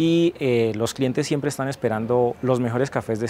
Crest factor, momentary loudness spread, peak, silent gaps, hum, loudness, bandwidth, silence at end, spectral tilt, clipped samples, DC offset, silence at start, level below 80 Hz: 16 dB; 4 LU; -6 dBFS; none; none; -22 LUFS; 16 kHz; 0 s; -6 dB/octave; under 0.1%; under 0.1%; 0 s; -56 dBFS